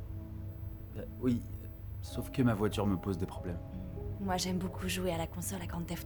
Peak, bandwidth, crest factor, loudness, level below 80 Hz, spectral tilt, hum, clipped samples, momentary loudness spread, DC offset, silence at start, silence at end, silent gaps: -18 dBFS; 17 kHz; 18 dB; -37 LUFS; -48 dBFS; -5.5 dB/octave; none; under 0.1%; 13 LU; under 0.1%; 0 s; 0 s; none